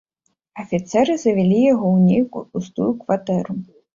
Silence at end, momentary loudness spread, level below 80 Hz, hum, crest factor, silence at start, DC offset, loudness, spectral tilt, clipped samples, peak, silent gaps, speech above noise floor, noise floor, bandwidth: 0.3 s; 13 LU; -58 dBFS; none; 14 dB; 0.55 s; under 0.1%; -19 LUFS; -7.5 dB/octave; under 0.1%; -4 dBFS; none; 53 dB; -71 dBFS; 7.4 kHz